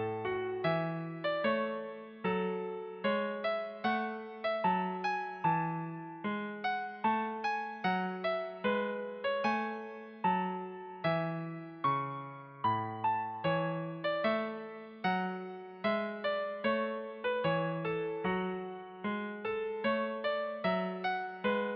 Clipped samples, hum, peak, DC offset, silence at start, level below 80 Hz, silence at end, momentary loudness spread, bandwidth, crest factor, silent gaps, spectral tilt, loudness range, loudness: under 0.1%; none; -18 dBFS; under 0.1%; 0 s; -74 dBFS; 0 s; 8 LU; 6.2 kHz; 16 dB; none; -4 dB/octave; 1 LU; -35 LUFS